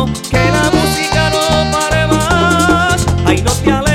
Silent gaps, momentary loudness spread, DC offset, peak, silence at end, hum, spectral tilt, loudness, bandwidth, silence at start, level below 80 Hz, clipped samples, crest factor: none; 2 LU; 0.1%; 0 dBFS; 0 s; none; -4.5 dB/octave; -12 LUFS; 16.5 kHz; 0 s; -24 dBFS; under 0.1%; 12 dB